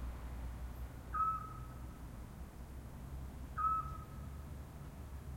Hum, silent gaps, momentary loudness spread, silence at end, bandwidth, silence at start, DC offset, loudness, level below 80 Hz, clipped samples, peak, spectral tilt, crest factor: none; none; 15 LU; 0 s; 16.5 kHz; 0 s; under 0.1%; -44 LUFS; -50 dBFS; under 0.1%; -26 dBFS; -6.5 dB/octave; 18 dB